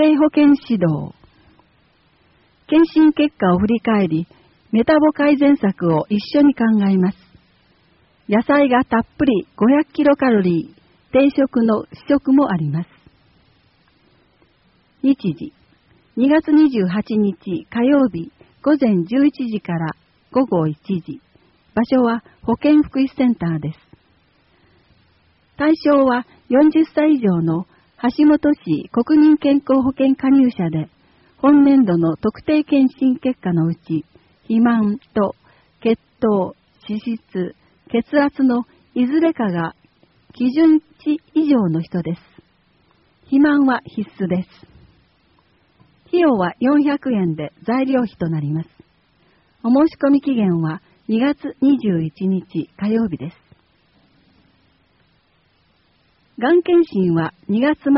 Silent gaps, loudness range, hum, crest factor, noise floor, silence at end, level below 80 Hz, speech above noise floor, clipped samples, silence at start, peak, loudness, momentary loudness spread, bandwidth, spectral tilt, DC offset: none; 6 LU; none; 14 dB; -60 dBFS; 0 s; -54 dBFS; 44 dB; under 0.1%; 0 s; -2 dBFS; -17 LUFS; 12 LU; 5.8 kHz; -6.5 dB/octave; under 0.1%